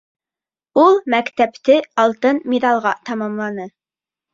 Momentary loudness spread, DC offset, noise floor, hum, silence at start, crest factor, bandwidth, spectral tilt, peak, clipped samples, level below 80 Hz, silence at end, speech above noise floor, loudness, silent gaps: 11 LU; under 0.1%; under -90 dBFS; none; 0.75 s; 16 dB; 7.6 kHz; -5.5 dB/octave; -2 dBFS; under 0.1%; -64 dBFS; 0.65 s; over 74 dB; -17 LUFS; none